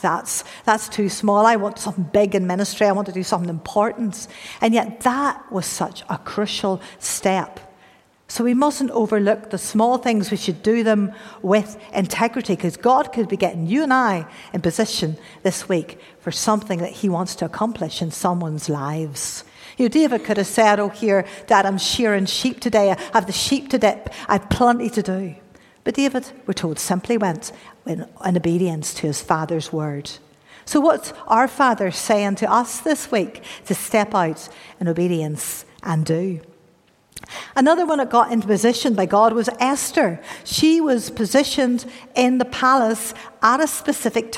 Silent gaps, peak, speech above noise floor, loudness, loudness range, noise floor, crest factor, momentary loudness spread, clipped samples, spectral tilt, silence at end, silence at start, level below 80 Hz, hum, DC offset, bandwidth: none; -2 dBFS; 37 dB; -20 LUFS; 5 LU; -56 dBFS; 18 dB; 10 LU; under 0.1%; -4.5 dB/octave; 0 s; 0 s; -54 dBFS; none; under 0.1%; 16.5 kHz